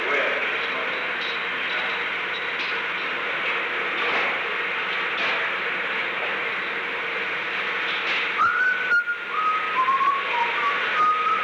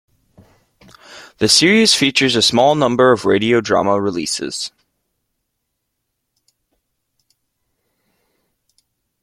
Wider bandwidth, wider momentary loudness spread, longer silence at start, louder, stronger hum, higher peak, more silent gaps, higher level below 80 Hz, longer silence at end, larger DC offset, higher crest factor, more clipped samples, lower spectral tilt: first, 19 kHz vs 15.5 kHz; second, 5 LU vs 11 LU; second, 0 s vs 1.1 s; second, -23 LUFS vs -14 LUFS; neither; second, -12 dBFS vs 0 dBFS; neither; second, -66 dBFS vs -56 dBFS; second, 0 s vs 4.55 s; neither; second, 12 dB vs 18 dB; neither; about the same, -2.5 dB/octave vs -3 dB/octave